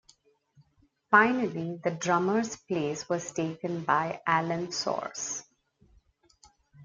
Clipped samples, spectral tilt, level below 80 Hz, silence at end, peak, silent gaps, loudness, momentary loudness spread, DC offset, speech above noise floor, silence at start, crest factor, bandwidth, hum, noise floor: under 0.1%; -4 dB/octave; -70 dBFS; 0 s; -6 dBFS; none; -28 LUFS; 11 LU; under 0.1%; 40 dB; 1.1 s; 24 dB; 9.6 kHz; none; -68 dBFS